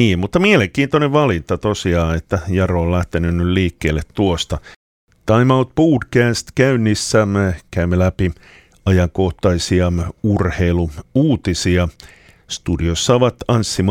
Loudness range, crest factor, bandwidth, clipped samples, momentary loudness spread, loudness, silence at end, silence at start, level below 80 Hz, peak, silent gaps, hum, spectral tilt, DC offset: 2 LU; 16 dB; 15 kHz; under 0.1%; 7 LU; -17 LUFS; 0 s; 0 s; -32 dBFS; 0 dBFS; 4.76-5.07 s; none; -6 dB/octave; under 0.1%